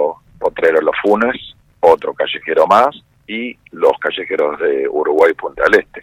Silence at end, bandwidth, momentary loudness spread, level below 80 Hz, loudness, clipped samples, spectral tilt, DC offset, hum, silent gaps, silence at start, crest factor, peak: 0 s; 11.5 kHz; 11 LU; -50 dBFS; -15 LUFS; 0.3%; -5 dB/octave; under 0.1%; none; none; 0 s; 14 dB; 0 dBFS